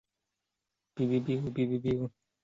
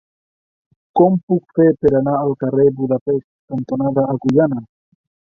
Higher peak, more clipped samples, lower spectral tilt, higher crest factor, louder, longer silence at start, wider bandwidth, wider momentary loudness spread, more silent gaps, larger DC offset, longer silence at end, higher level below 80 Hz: second, -18 dBFS vs -2 dBFS; neither; second, -9 dB/octave vs -10.5 dB/octave; about the same, 16 dB vs 16 dB; second, -32 LUFS vs -17 LUFS; about the same, 0.95 s vs 0.95 s; about the same, 7.4 kHz vs 6.8 kHz; about the same, 8 LU vs 9 LU; second, none vs 1.23-1.28 s, 3.01-3.06 s, 3.24-3.48 s; neither; second, 0.35 s vs 0.75 s; second, -62 dBFS vs -50 dBFS